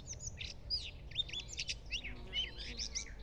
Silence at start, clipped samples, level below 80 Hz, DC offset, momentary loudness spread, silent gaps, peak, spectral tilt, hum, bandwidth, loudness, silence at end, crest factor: 0 s; under 0.1%; -52 dBFS; under 0.1%; 5 LU; none; -24 dBFS; -1 dB/octave; none; 11 kHz; -41 LUFS; 0 s; 18 dB